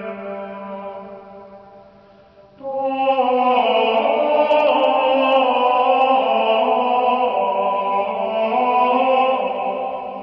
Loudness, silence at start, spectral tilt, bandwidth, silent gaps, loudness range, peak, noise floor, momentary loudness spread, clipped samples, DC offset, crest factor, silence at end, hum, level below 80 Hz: -17 LUFS; 0 s; -6.5 dB/octave; 5.6 kHz; none; 6 LU; -4 dBFS; -48 dBFS; 15 LU; under 0.1%; under 0.1%; 14 dB; 0 s; none; -64 dBFS